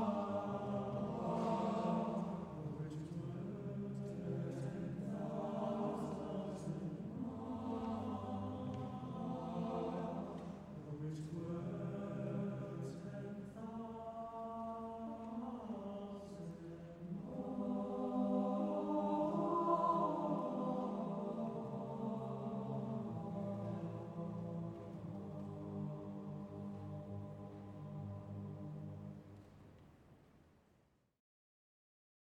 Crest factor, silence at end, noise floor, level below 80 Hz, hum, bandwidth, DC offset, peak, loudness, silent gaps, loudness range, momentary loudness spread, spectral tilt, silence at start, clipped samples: 20 dB; 1.9 s; -75 dBFS; -70 dBFS; none; 10.5 kHz; under 0.1%; -24 dBFS; -43 LUFS; none; 11 LU; 11 LU; -9 dB/octave; 0 s; under 0.1%